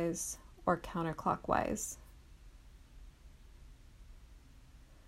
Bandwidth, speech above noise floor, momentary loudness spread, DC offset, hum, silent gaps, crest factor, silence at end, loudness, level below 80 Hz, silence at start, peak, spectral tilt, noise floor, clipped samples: 16 kHz; 22 dB; 26 LU; under 0.1%; none; none; 24 dB; 0 s; -36 LUFS; -56 dBFS; 0 s; -16 dBFS; -5 dB/octave; -58 dBFS; under 0.1%